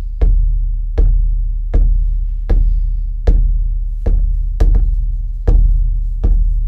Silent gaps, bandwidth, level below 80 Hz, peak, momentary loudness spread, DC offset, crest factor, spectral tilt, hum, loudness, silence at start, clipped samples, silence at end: none; 1.9 kHz; -12 dBFS; 0 dBFS; 6 LU; under 0.1%; 12 dB; -9.5 dB/octave; none; -18 LUFS; 0 s; under 0.1%; 0 s